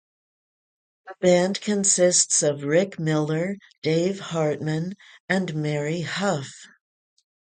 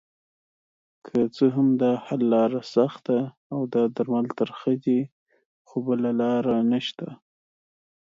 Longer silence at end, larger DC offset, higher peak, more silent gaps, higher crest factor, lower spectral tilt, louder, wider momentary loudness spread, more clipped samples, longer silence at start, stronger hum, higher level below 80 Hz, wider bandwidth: about the same, 0.9 s vs 0.95 s; neither; about the same, -6 dBFS vs -8 dBFS; second, 3.78-3.82 s, 5.20-5.28 s vs 3.37-3.50 s, 5.12-5.26 s, 5.45-5.65 s; about the same, 18 dB vs 16 dB; second, -4 dB/octave vs -8 dB/octave; about the same, -23 LUFS vs -24 LUFS; about the same, 12 LU vs 10 LU; neither; about the same, 1.05 s vs 1.05 s; neither; about the same, -68 dBFS vs -70 dBFS; first, 9.6 kHz vs 7.4 kHz